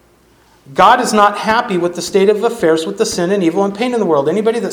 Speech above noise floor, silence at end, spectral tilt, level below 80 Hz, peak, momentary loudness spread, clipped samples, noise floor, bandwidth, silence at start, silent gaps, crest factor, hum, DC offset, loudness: 37 dB; 0 s; -4.5 dB/octave; -52 dBFS; 0 dBFS; 7 LU; 0.2%; -50 dBFS; 18 kHz; 0.7 s; none; 14 dB; none; under 0.1%; -13 LUFS